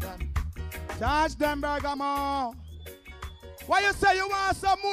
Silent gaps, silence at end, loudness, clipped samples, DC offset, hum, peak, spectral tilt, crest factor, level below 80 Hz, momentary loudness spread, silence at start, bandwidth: none; 0 s; -27 LUFS; under 0.1%; under 0.1%; none; -10 dBFS; -4.5 dB/octave; 18 dB; -40 dBFS; 20 LU; 0 s; 16 kHz